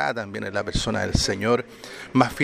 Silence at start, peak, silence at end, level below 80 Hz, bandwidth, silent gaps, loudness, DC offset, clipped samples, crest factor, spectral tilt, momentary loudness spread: 0 s; -2 dBFS; 0 s; -38 dBFS; 15 kHz; none; -24 LUFS; under 0.1%; under 0.1%; 22 dB; -4.5 dB/octave; 8 LU